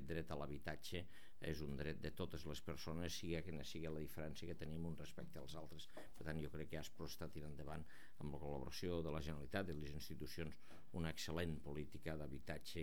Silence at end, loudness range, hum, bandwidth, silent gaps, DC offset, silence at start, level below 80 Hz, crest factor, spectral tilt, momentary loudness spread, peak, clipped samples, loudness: 0 s; 4 LU; none; over 20 kHz; none; 0.4%; 0 s; -60 dBFS; 20 dB; -5.5 dB/octave; 9 LU; -30 dBFS; under 0.1%; -50 LUFS